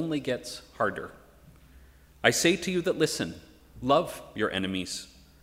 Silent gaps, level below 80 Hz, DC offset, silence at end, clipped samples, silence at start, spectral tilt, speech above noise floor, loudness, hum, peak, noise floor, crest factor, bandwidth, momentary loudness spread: none; -58 dBFS; under 0.1%; 0.3 s; under 0.1%; 0 s; -3.5 dB/octave; 26 dB; -28 LUFS; none; -4 dBFS; -54 dBFS; 26 dB; 16 kHz; 16 LU